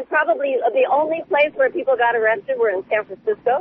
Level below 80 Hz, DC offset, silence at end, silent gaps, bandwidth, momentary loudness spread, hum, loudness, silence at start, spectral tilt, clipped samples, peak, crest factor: -66 dBFS; under 0.1%; 0 s; none; 4.1 kHz; 5 LU; none; -19 LUFS; 0 s; -1 dB/octave; under 0.1%; -6 dBFS; 14 dB